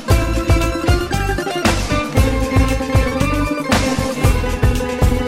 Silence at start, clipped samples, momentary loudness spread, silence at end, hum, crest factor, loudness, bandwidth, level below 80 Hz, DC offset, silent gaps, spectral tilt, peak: 0 s; under 0.1%; 2 LU; 0 s; none; 14 dB; -17 LUFS; 16.5 kHz; -20 dBFS; under 0.1%; none; -5.5 dB/octave; -2 dBFS